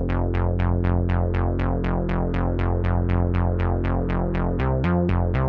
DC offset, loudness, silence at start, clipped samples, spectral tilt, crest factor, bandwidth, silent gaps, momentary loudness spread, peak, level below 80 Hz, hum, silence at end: under 0.1%; -23 LUFS; 0 s; under 0.1%; -10.5 dB/octave; 12 dB; 4.5 kHz; none; 3 LU; -8 dBFS; -28 dBFS; none; 0 s